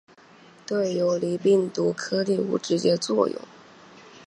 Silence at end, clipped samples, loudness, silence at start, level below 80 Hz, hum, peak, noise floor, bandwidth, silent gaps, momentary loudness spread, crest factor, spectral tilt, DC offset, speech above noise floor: 0.05 s; under 0.1%; -24 LUFS; 0.7 s; -74 dBFS; none; -8 dBFS; -52 dBFS; 10.5 kHz; none; 6 LU; 18 dB; -5.5 dB/octave; under 0.1%; 28 dB